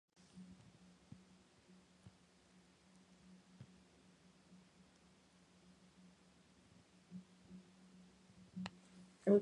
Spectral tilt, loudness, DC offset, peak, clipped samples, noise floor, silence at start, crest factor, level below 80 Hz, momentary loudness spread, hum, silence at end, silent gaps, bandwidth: -7.5 dB/octave; -49 LUFS; under 0.1%; -20 dBFS; under 0.1%; -69 dBFS; 0.35 s; 28 dB; -82 dBFS; 17 LU; none; 0 s; none; 10.5 kHz